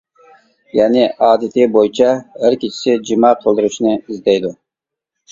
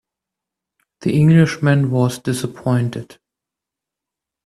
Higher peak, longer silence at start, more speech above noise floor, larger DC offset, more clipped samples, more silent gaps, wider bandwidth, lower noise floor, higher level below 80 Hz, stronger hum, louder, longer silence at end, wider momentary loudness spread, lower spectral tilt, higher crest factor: about the same, 0 dBFS vs -2 dBFS; second, 0.75 s vs 1 s; about the same, 70 dB vs 69 dB; neither; neither; neither; second, 7.6 kHz vs 13.5 kHz; about the same, -84 dBFS vs -85 dBFS; about the same, -56 dBFS vs -54 dBFS; neither; first, -14 LUFS vs -17 LUFS; second, 0.8 s vs 1.4 s; second, 5 LU vs 12 LU; second, -5 dB/octave vs -7 dB/octave; about the same, 14 dB vs 18 dB